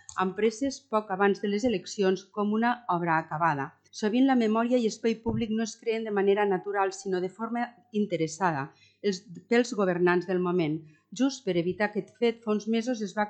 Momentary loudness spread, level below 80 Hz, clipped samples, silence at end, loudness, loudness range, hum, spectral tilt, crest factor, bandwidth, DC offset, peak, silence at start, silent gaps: 8 LU; -64 dBFS; under 0.1%; 0 s; -28 LUFS; 2 LU; none; -5.5 dB/octave; 18 dB; 9 kHz; under 0.1%; -10 dBFS; 0.1 s; none